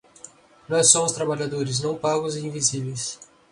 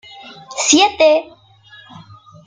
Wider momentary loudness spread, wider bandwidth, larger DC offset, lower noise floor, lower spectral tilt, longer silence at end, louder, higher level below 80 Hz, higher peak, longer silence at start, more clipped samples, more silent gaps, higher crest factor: second, 14 LU vs 24 LU; first, 11 kHz vs 9.6 kHz; neither; about the same, -48 dBFS vs -45 dBFS; first, -3 dB/octave vs -1 dB/octave; second, 0.3 s vs 1.2 s; second, -22 LUFS vs -13 LUFS; about the same, -62 dBFS vs -58 dBFS; about the same, 0 dBFS vs 0 dBFS; about the same, 0.25 s vs 0.25 s; neither; neither; first, 24 dB vs 18 dB